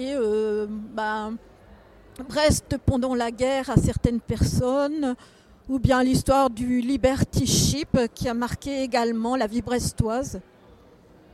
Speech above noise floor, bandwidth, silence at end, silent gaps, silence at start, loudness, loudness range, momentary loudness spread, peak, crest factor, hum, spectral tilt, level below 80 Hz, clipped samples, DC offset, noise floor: 29 dB; 15 kHz; 0.9 s; none; 0 s; -24 LUFS; 4 LU; 9 LU; -2 dBFS; 22 dB; none; -5 dB/octave; -38 dBFS; under 0.1%; under 0.1%; -52 dBFS